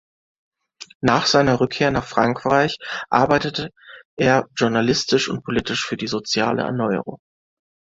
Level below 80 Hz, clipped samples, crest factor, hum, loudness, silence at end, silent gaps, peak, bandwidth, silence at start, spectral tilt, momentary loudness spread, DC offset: -50 dBFS; under 0.1%; 20 dB; none; -20 LUFS; 0.8 s; 0.95-1.00 s, 4.05-4.17 s; -2 dBFS; 7.8 kHz; 0.8 s; -4.5 dB/octave; 9 LU; under 0.1%